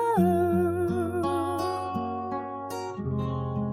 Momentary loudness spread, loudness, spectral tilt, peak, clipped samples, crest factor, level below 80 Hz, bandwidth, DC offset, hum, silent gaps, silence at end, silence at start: 10 LU; -28 LUFS; -7.5 dB/octave; -12 dBFS; under 0.1%; 16 dB; -54 dBFS; 15.5 kHz; under 0.1%; none; none; 0 s; 0 s